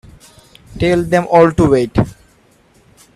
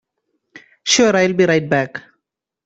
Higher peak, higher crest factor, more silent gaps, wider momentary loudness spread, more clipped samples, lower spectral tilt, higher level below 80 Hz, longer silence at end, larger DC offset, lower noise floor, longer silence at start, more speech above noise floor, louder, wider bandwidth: about the same, 0 dBFS vs -2 dBFS; about the same, 16 dB vs 18 dB; neither; second, 9 LU vs 14 LU; neither; first, -7 dB/octave vs -3.5 dB/octave; first, -36 dBFS vs -58 dBFS; first, 1.05 s vs 0.65 s; neither; second, -51 dBFS vs -76 dBFS; first, 0.75 s vs 0.55 s; second, 39 dB vs 61 dB; about the same, -13 LUFS vs -15 LUFS; first, 13.5 kHz vs 8.2 kHz